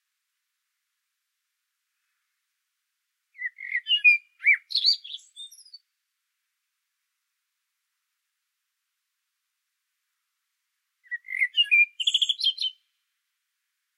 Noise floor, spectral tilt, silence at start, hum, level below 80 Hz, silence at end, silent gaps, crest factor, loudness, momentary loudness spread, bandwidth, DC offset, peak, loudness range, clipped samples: -81 dBFS; 12 dB/octave; 3.4 s; none; under -90 dBFS; 1.25 s; none; 22 dB; -21 LUFS; 20 LU; 13 kHz; under 0.1%; -8 dBFS; 14 LU; under 0.1%